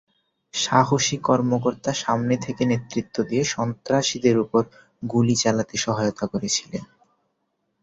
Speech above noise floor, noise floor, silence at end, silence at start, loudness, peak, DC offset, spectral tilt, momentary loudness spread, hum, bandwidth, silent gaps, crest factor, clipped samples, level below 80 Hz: 52 dB; -74 dBFS; 1 s; 0.55 s; -22 LUFS; -2 dBFS; under 0.1%; -4.5 dB/octave; 8 LU; none; 8 kHz; none; 20 dB; under 0.1%; -58 dBFS